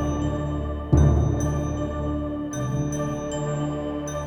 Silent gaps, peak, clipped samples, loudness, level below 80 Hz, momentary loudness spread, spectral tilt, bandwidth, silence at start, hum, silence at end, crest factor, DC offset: none; -6 dBFS; under 0.1%; -25 LUFS; -30 dBFS; 9 LU; -7 dB/octave; 15.5 kHz; 0 s; none; 0 s; 18 dB; under 0.1%